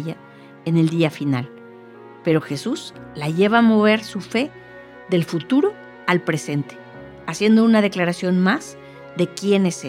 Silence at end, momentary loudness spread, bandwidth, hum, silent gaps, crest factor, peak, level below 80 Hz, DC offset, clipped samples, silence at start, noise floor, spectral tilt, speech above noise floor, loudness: 0 s; 20 LU; 14 kHz; none; none; 20 dB; -2 dBFS; -62 dBFS; under 0.1%; under 0.1%; 0 s; -42 dBFS; -6 dB/octave; 23 dB; -20 LUFS